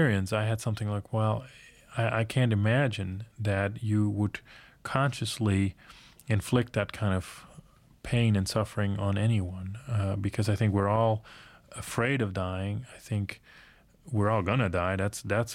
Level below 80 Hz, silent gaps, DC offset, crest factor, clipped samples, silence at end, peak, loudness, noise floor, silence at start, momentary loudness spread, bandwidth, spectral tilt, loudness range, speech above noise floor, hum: -54 dBFS; none; under 0.1%; 22 dB; under 0.1%; 0 s; -8 dBFS; -29 LUFS; -54 dBFS; 0 s; 12 LU; 14.5 kHz; -6.5 dB/octave; 2 LU; 26 dB; none